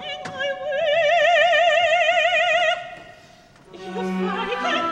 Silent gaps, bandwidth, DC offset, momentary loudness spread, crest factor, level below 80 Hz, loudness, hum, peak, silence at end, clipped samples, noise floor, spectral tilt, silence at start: none; 8.8 kHz; under 0.1%; 14 LU; 14 dB; -60 dBFS; -19 LUFS; none; -6 dBFS; 0 s; under 0.1%; -49 dBFS; -3.5 dB/octave; 0 s